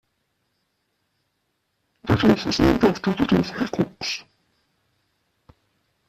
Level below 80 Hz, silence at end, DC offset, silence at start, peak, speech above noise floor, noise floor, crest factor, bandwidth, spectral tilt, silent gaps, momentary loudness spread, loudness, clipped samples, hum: -44 dBFS; 1.85 s; under 0.1%; 2.05 s; -4 dBFS; 53 dB; -73 dBFS; 22 dB; 14.5 kHz; -6 dB/octave; none; 10 LU; -21 LUFS; under 0.1%; none